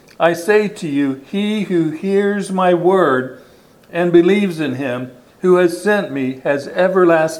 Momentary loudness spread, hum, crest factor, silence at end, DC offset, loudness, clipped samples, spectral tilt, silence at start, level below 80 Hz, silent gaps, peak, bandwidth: 9 LU; none; 16 dB; 0 s; under 0.1%; -16 LUFS; under 0.1%; -6.5 dB/octave; 0.2 s; -62 dBFS; none; 0 dBFS; 14 kHz